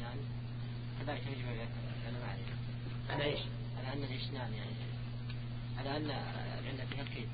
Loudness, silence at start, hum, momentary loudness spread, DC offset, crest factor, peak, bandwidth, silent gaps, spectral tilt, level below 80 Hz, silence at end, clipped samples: -41 LUFS; 0 s; none; 5 LU; under 0.1%; 18 dB; -22 dBFS; 4.9 kHz; none; -5 dB/octave; -54 dBFS; 0 s; under 0.1%